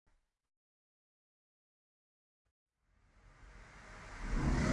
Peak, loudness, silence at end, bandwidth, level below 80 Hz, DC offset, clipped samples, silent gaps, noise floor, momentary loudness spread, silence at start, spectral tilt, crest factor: -20 dBFS; -39 LUFS; 0 s; 11.5 kHz; -46 dBFS; under 0.1%; under 0.1%; none; -72 dBFS; 24 LU; 3.4 s; -6 dB/octave; 22 dB